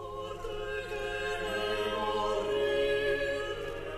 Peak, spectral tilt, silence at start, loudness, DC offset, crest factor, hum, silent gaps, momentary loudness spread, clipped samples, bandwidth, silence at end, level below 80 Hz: -18 dBFS; -4 dB/octave; 0 s; -32 LUFS; under 0.1%; 14 dB; none; none; 9 LU; under 0.1%; 14 kHz; 0 s; -48 dBFS